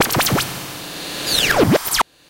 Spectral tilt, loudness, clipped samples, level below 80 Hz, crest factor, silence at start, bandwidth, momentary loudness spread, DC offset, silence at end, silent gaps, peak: -3 dB/octave; -17 LUFS; under 0.1%; -42 dBFS; 14 dB; 0 s; 17.5 kHz; 14 LU; under 0.1%; 0.3 s; none; -4 dBFS